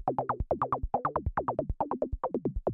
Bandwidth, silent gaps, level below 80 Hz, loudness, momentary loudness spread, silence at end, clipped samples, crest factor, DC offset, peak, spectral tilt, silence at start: 4.2 kHz; none; -40 dBFS; -33 LUFS; 2 LU; 0 s; under 0.1%; 16 dB; under 0.1%; -16 dBFS; -11.5 dB/octave; 0 s